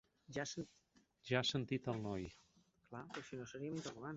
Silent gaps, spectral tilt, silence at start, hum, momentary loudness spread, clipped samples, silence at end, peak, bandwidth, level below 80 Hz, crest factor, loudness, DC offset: none; -4 dB/octave; 0.3 s; none; 16 LU; under 0.1%; 0 s; -20 dBFS; 8 kHz; -70 dBFS; 24 dB; -44 LUFS; under 0.1%